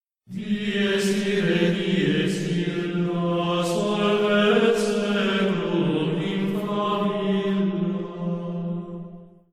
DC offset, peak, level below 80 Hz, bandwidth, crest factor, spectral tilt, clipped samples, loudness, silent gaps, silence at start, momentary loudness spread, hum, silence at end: 0.1%; -8 dBFS; -58 dBFS; 14 kHz; 16 dB; -6 dB/octave; under 0.1%; -23 LUFS; none; 0.3 s; 9 LU; none; 0.25 s